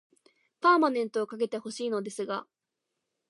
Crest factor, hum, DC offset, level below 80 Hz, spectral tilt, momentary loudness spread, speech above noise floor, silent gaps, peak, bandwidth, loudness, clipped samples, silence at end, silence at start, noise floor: 20 dB; none; under 0.1%; -86 dBFS; -4.5 dB/octave; 12 LU; 57 dB; none; -10 dBFS; 11.5 kHz; -29 LUFS; under 0.1%; 0.85 s; 0.6 s; -85 dBFS